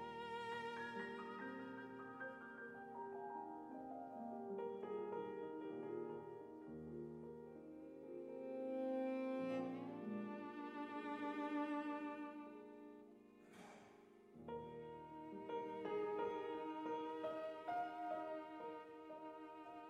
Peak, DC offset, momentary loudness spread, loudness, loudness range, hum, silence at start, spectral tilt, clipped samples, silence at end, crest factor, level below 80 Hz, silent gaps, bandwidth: -34 dBFS; under 0.1%; 13 LU; -49 LUFS; 6 LU; none; 0 s; -6.5 dB/octave; under 0.1%; 0 s; 16 dB; -84 dBFS; none; 12 kHz